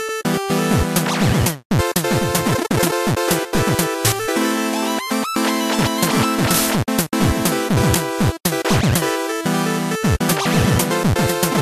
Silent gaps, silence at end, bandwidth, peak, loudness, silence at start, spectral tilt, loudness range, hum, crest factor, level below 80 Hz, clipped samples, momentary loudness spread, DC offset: 1.65-1.70 s; 0 s; 15 kHz; -2 dBFS; -18 LUFS; 0 s; -4.5 dB/octave; 1 LU; none; 16 dB; -36 dBFS; under 0.1%; 4 LU; under 0.1%